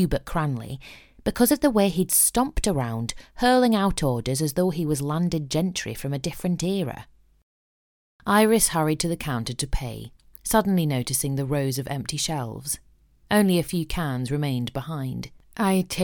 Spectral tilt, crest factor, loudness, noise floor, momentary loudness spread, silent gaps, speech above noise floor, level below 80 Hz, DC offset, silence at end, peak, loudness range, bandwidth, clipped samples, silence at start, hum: -4.5 dB/octave; 20 dB; -24 LUFS; under -90 dBFS; 13 LU; 7.43-8.19 s; over 66 dB; -40 dBFS; under 0.1%; 0 s; -4 dBFS; 5 LU; 19 kHz; under 0.1%; 0 s; none